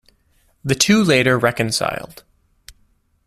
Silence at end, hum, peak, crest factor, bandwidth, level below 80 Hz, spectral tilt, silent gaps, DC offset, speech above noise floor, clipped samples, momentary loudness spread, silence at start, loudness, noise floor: 1.3 s; none; 0 dBFS; 20 dB; 14.5 kHz; -50 dBFS; -4 dB/octave; none; under 0.1%; 43 dB; under 0.1%; 17 LU; 0.65 s; -16 LUFS; -60 dBFS